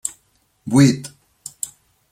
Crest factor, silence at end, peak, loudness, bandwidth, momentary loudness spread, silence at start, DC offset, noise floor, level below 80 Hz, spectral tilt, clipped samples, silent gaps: 20 dB; 0.45 s; -2 dBFS; -19 LUFS; 16 kHz; 23 LU; 0.05 s; under 0.1%; -62 dBFS; -58 dBFS; -5.5 dB/octave; under 0.1%; none